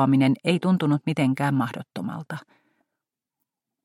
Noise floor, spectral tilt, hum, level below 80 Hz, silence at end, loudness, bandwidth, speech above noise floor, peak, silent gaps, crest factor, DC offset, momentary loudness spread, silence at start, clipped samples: -85 dBFS; -7.5 dB/octave; none; -68 dBFS; 1.45 s; -24 LUFS; 12.5 kHz; 63 dB; -8 dBFS; none; 18 dB; under 0.1%; 14 LU; 0 s; under 0.1%